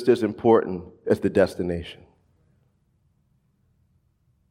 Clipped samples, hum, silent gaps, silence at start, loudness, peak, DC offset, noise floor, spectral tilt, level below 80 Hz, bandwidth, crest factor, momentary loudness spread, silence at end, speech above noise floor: under 0.1%; none; none; 0 s; -23 LUFS; -4 dBFS; under 0.1%; -66 dBFS; -7.5 dB/octave; -58 dBFS; 13 kHz; 22 dB; 13 LU; 2.55 s; 44 dB